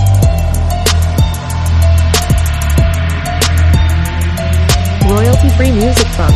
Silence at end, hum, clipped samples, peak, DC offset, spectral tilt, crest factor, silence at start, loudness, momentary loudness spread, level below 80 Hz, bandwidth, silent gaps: 0 s; none; under 0.1%; 0 dBFS; under 0.1%; -5.5 dB/octave; 10 dB; 0 s; -12 LUFS; 5 LU; -14 dBFS; 13.5 kHz; none